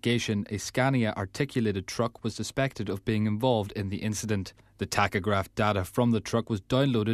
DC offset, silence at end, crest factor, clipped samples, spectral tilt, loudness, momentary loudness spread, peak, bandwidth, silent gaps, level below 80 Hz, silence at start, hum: under 0.1%; 0 s; 20 dB; under 0.1%; -5.5 dB/octave; -29 LUFS; 6 LU; -8 dBFS; 14 kHz; none; -54 dBFS; 0.05 s; none